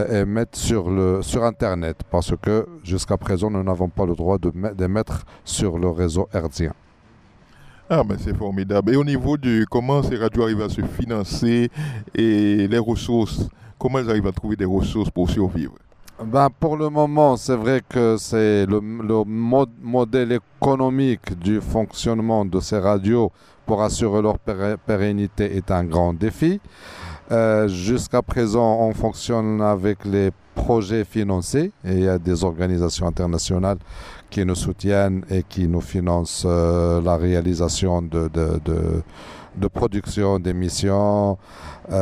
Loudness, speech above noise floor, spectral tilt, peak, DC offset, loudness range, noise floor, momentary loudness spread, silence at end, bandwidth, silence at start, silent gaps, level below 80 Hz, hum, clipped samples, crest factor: -21 LUFS; 31 dB; -6.5 dB/octave; -2 dBFS; under 0.1%; 3 LU; -51 dBFS; 7 LU; 0 s; 14 kHz; 0 s; none; -36 dBFS; none; under 0.1%; 18 dB